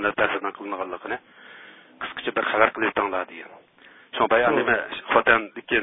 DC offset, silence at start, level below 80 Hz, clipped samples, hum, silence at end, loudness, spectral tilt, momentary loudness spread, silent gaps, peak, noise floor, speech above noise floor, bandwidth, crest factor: under 0.1%; 0 s; -58 dBFS; under 0.1%; none; 0 s; -23 LUFS; -8.5 dB/octave; 16 LU; none; -2 dBFS; -47 dBFS; 24 dB; 4 kHz; 24 dB